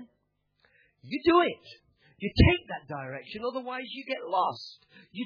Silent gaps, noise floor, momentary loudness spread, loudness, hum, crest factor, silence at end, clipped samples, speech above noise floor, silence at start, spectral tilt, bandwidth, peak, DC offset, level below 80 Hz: none; -75 dBFS; 17 LU; -28 LUFS; none; 22 dB; 0 s; under 0.1%; 47 dB; 0 s; -8 dB/octave; 5.4 kHz; -8 dBFS; under 0.1%; -40 dBFS